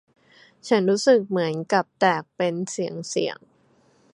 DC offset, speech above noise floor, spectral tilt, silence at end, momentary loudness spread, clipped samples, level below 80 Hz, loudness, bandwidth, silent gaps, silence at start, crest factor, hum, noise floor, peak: under 0.1%; 38 dB; -4.5 dB/octave; 0.8 s; 10 LU; under 0.1%; -74 dBFS; -23 LUFS; 11 kHz; none; 0.65 s; 20 dB; none; -60 dBFS; -4 dBFS